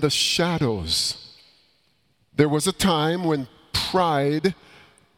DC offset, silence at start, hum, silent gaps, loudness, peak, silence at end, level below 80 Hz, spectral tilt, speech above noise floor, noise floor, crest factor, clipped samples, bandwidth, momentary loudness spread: under 0.1%; 0 s; none; none; -22 LUFS; -4 dBFS; 0.65 s; -48 dBFS; -4 dB/octave; 44 dB; -66 dBFS; 20 dB; under 0.1%; 17 kHz; 8 LU